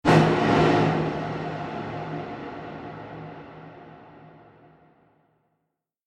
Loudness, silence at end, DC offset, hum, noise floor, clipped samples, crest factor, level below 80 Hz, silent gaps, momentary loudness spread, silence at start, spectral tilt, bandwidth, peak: -24 LUFS; 1.75 s; under 0.1%; none; -80 dBFS; under 0.1%; 22 dB; -52 dBFS; none; 24 LU; 0.05 s; -7 dB/octave; 10 kHz; -4 dBFS